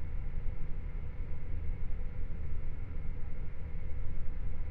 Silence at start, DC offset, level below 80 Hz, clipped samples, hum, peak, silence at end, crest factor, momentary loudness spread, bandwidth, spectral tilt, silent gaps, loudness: 0 s; under 0.1%; -36 dBFS; under 0.1%; none; -20 dBFS; 0 s; 10 dB; 2 LU; 2.8 kHz; -10 dB/octave; none; -43 LUFS